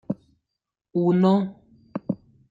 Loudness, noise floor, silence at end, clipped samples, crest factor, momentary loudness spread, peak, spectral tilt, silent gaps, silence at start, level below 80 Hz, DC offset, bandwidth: -24 LUFS; -84 dBFS; 0.35 s; under 0.1%; 18 dB; 15 LU; -8 dBFS; -10 dB/octave; none; 0.1 s; -66 dBFS; under 0.1%; 4.8 kHz